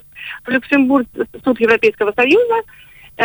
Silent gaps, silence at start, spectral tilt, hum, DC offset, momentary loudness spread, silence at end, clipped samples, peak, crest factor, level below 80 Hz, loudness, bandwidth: none; 0.15 s; -5.5 dB/octave; none; under 0.1%; 10 LU; 0 s; under 0.1%; -2 dBFS; 14 dB; -52 dBFS; -15 LUFS; over 20 kHz